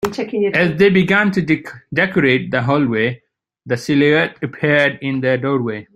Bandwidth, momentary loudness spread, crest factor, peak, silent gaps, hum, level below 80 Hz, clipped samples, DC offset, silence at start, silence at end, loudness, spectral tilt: 15 kHz; 8 LU; 16 dB; 0 dBFS; none; none; -52 dBFS; under 0.1%; under 0.1%; 0 s; 0.15 s; -16 LUFS; -6.5 dB/octave